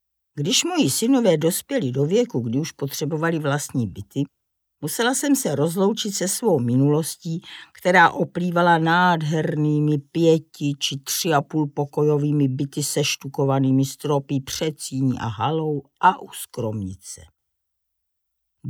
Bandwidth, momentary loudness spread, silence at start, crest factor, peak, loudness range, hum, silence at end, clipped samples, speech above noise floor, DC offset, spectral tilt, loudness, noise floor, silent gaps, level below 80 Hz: over 20 kHz; 11 LU; 0.35 s; 18 dB; -4 dBFS; 5 LU; none; 0 s; under 0.1%; 56 dB; under 0.1%; -4.5 dB/octave; -21 LUFS; -77 dBFS; none; -62 dBFS